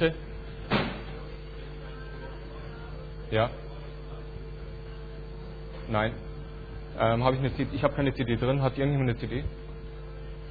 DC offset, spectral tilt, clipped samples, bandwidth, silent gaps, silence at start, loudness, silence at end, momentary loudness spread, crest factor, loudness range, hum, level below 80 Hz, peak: under 0.1%; -9.5 dB/octave; under 0.1%; 4.9 kHz; none; 0 s; -30 LUFS; 0 s; 15 LU; 24 dB; 8 LU; none; -42 dBFS; -8 dBFS